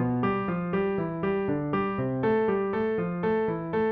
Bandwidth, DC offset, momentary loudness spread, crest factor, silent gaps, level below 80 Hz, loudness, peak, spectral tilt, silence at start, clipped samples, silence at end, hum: 4.8 kHz; under 0.1%; 3 LU; 12 dB; none; -54 dBFS; -28 LUFS; -14 dBFS; -7 dB/octave; 0 s; under 0.1%; 0 s; none